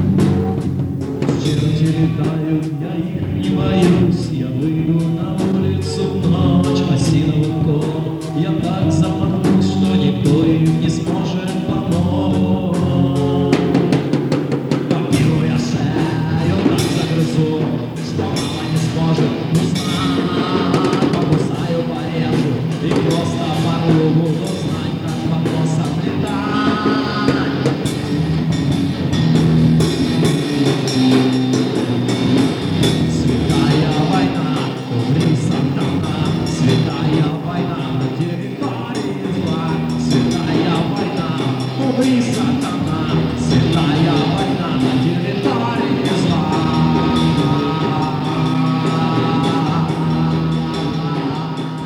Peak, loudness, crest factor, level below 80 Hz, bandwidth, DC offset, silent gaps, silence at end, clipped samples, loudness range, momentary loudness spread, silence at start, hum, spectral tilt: -2 dBFS; -17 LUFS; 14 dB; -40 dBFS; 13 kHz; under 0.1%; none; 0 s; under 0.1%; 2 LU; 6 LU; 0 s; none; -7 dB/octave